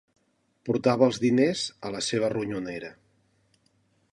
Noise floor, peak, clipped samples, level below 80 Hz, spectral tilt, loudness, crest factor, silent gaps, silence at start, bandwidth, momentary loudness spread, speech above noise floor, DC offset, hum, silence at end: -68 dBFS; -8 dBFS; under 0.1%; -66 dBFS; -5 dB/octave; -26 LUFS; 20 dB; none; 0.65 s; 11.5 kHz; 15 LU; 43 dB; under 0.1%; none; 1.2 s